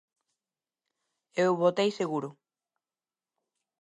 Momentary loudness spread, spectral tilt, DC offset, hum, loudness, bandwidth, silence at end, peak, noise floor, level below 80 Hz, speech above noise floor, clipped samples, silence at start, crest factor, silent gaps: 12 LU; -5.5 dB/octave; under 0.1%; none; -28 LUFS; 10.5 kHz; 1.5 s; -12 dBFS; under -90 dBFS; -86 dBFS; over 63 dB; under 0.1%; 1.35 s; 20 dB; none